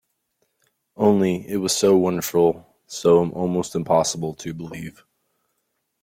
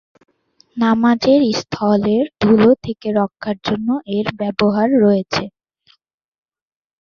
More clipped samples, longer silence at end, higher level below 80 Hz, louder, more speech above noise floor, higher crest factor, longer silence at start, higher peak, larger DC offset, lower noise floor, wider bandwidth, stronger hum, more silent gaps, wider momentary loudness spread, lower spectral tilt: neither; second, 1.1 s vs 1.5 s; second, -58 dBFS vs -52 dBFS; second, -20 LUFS vs -16 LUFS; first, 54 dB vs 42 dB; about the same, 18 dB vs 16 dB; first, 1 s vs 0.75 s; second, -4 dBFS vs 0 dBFS; neither; first, -74 dBFS vs -57 dBFS; first, 16.5 kHz vs 7 kHz; neither; neither; first, 16 LU vs 9 LU; second, -5 dB/octave vs -6.5 dB/octave